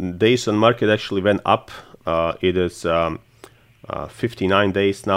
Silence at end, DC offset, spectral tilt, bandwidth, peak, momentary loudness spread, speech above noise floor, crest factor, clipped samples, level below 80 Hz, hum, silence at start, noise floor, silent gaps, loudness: 0 s; under 0.1%; -5.5 dB/octave; 15.5 kHz; -2 dBFS; 14 LU; 29 dB; 18 dB; under 0.1%; -52 dBFS; none; 0 s; -48 dBFS; none; -19 LUFS